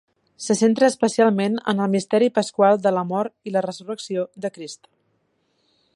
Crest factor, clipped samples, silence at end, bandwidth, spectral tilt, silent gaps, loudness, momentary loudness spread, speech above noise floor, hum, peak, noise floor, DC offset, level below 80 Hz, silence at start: 18 dB; under 0.1%; 1.2 s; 11.5 kHz; -5 dB/octave; none; -21 LUFS; 14 LU; 48 dB; none; -4 dBFS; -68 dBFS; under 0.1%; -72 dBFS; 0.4 s